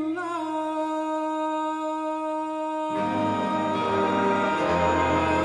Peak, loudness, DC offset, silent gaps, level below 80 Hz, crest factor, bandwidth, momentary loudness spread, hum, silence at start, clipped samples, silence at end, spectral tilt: -12 dBFS; -26 LUFS; under 0.1%; none; -52 dBFS; 14 dB; 11 kHz; 6 LU; none; 0 s; under 0.1%; 0 s; -6 dB/octave